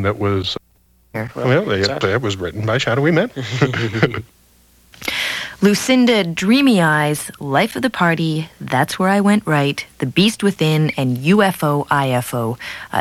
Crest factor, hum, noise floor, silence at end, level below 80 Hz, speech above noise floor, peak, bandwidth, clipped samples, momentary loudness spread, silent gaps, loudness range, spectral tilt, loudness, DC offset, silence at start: 18 dB; none; -55 dBFS; 0 s; -52 dBFS; 38 dB; 0 dBFS; 16 kHz; under 0.1%; 9 LU; none; 3 LU; -5.5 dB/octave; -17 LUFS; under 0.1%; 0 s